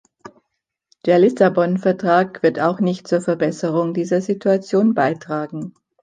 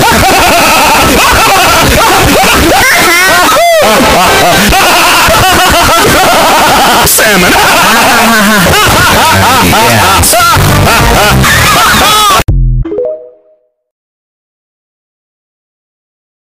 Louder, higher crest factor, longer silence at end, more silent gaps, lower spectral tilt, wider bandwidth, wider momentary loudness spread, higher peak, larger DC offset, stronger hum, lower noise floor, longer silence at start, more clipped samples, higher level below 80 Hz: second, -18 LUFS vs -3 LUFS; first, 16 dB vs 6 dB; second, 0.3 s vs 3.15 s; neither; first, -7 dB/octave vs -3 dB/octave; second, 9.4 kHz vs 16.5 kHz; first, 10 LU vs 2 LU; about the same, -2 dBFS vs 0 dBFS; second, under 0.1% vs 2%; neither; first, -77 dBFS vs -48 dBFS; first, 0.25 s vs 0 s; neither; second, -66 dBFS vs -20 dBFS